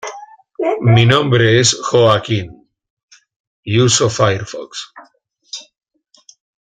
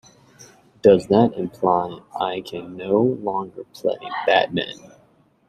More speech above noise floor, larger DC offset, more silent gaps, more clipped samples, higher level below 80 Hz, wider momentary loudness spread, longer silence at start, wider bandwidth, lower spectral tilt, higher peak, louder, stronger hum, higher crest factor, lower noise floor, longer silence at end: about the same, 36 dB vs 37 dB; neither; first, 2.90-2.97 s, 3.03-3.08 s, 3.36-3.63 s vs none; neither; first, -50 dBFS vs -58 dBFS; first, 22 LU vs 15 LU; second, 0.05 s vs 0.4 s; second, 9.4 kHz vs 13 kHz; second, -4.5 dB/octave vs -6.5 dB/octave; about the same, 0 dBFS vs -2 dBFS; first, -13 LUFS vs -21 LUFS; neither; about the same, 16 dB vs 20 dB; second, -49 dBFS vs -57 dBFS; first, 1.1 s vs 0.75 s